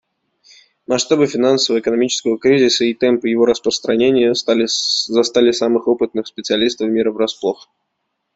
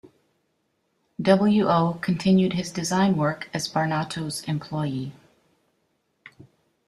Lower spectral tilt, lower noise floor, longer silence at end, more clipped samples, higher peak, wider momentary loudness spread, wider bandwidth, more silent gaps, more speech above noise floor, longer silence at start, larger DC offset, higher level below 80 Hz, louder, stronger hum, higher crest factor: second, -3.5 dB/octave vs -6 dB/octave; about the same, -73 dBFS vs -72 dBFS; first, 0.8 s vs 0.6 s; neither; about the same, -2 dBFS vs -4 dBFS; second, 6 LU vs 10 LU; second, 8 kHz vs 13 kHz; neither; first, 57 dB vs 50 dB; second, 0.9 s vs 1.2 s; neither; about the same, -58 dBFS vs -60 dBFS; first, -16 LUFS vs -23 LUFS; neither; second, 14 dB vs 20 dB